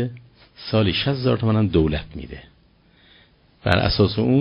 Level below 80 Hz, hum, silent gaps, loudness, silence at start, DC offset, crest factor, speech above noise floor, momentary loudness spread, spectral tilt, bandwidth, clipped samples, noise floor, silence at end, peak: -38 dBFS; none; none; -20 LUFS; 0 s; under 0.1%; 22 dB; 36 dB; 18 LU; -5.5 dB/octave; 5.6 kHz; under 0.1%; -56 dBFS; 0 s; 0 dBFS